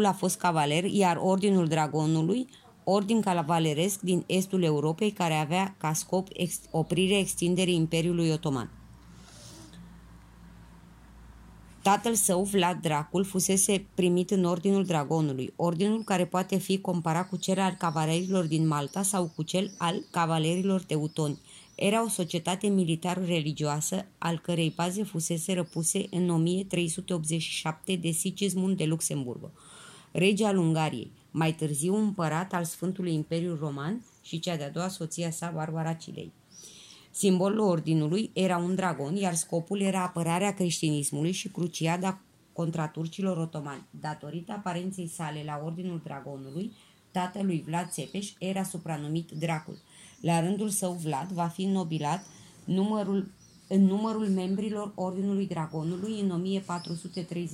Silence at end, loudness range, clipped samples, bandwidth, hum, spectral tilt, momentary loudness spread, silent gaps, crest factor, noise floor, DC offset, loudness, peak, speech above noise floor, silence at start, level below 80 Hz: 0 s; 7 LU; under 0.1%; 16 kHz; none; -5 dB/octave; 11 LU; none; 18 dB; -52 dBFS; under 0.1%; -29 LUFS; -10 dBFS; 23 dB; 0 s; -64 dBFS